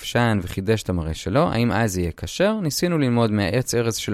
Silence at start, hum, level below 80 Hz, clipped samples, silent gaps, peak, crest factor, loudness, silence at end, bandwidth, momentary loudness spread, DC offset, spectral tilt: 0 s; none; -42 dBFS; under 0.1%; none; -4 dBFS; 16 dB; -22 LUFS; 0 s; 15.5 kHz; 5 LU; under 0.1%; -5.5 dB/octave